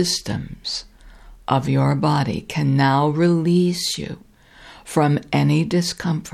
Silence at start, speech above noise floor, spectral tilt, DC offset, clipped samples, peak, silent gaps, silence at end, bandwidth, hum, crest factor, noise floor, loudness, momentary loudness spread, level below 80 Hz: 0 s; 26 dB; -5.5 dB/octave; under 0.1%; under 0.1%; -2 dBFS; none; 0.05 s; 14.5 kHz; none; 18 dB; -46 dBFS; -20 LUFS; 11 LU; -48 dBFS